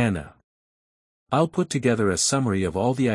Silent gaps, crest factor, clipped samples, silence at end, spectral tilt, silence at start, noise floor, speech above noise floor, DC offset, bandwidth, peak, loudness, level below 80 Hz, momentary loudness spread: 0.44-1.26 s; 18 dB; under 0.1%; 0 s; -5 dB/octave; 0 s; under -90 dBFS; over 68 dB; under 0.1%; 12 kHz; -6 dBFS; -23 LUFS; -54 dBFS; 5 LU